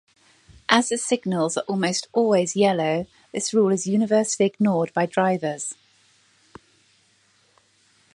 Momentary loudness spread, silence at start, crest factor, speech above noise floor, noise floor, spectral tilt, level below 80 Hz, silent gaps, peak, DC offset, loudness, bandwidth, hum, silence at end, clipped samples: 9 LU; 0.7 s; 24 dB; 40 dB; -62 dBFS; -4.5 dB/octave; -64 dBFS; none; 0 dBFS; under 0.1%; -22 LUFS; 11.5 kHz; none; 2.45 s; under 0.1%